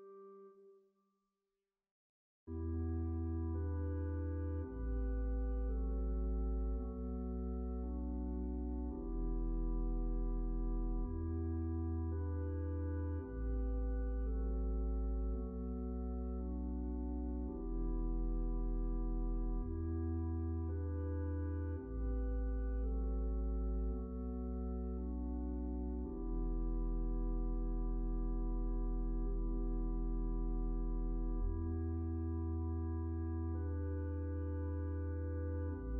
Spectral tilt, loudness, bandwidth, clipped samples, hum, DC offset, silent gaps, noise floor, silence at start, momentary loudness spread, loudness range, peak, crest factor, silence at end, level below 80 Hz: -9.5 dB/octave; -42 LUFS; 1.8 kHz; under 0.1%; none; under 0.1%; 1.91-2.47 s; under -90 dBFS; 0 s; 3 LU; 1 LU; -28 dBFS; 10 dB; 0 s; -40 dBFS